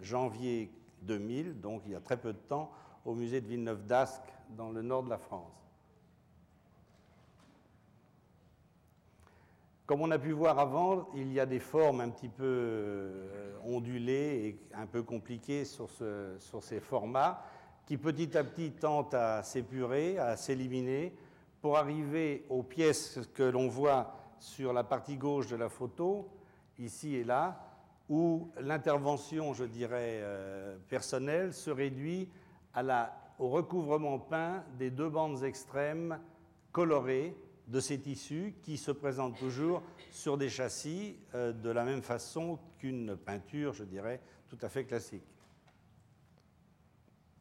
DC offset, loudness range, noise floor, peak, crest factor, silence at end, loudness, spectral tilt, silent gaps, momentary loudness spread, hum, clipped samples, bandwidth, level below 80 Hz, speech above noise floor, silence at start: under 0.1%; 7 LU; -67 dBFS; -20 dBFS; 16 dB; 2.2 s; -36 LUFS; -6 dB/octave; none; 12 LU; none; under 0.1%; 16 kHz; -74 dBFS; 31 dB; 0 s